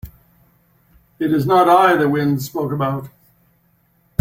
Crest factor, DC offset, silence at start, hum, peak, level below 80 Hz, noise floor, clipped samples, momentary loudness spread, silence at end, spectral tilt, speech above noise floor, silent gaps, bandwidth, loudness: 16 dB; under 0.1%; 0.05 s; none; -2 dBFS; -50 dBFS; -59 dBFS; under 0.1%; 13 LU; 1.15 s; -6.5 dB/octave; 44 dB; none; 16.5 kHz; -17 LUFS